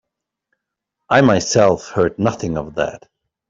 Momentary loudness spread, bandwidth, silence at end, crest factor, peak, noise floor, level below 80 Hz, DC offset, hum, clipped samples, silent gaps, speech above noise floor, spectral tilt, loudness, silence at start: 10 LU; 7.8 kHz; 0.55 s; 16 dB; -2 dBFS; -80 dBFS; -48 dBFS; under 0.1%; none; under 0.1%; none; 63 dB; -5 dB/octave; -17 LUFS; 1.1 s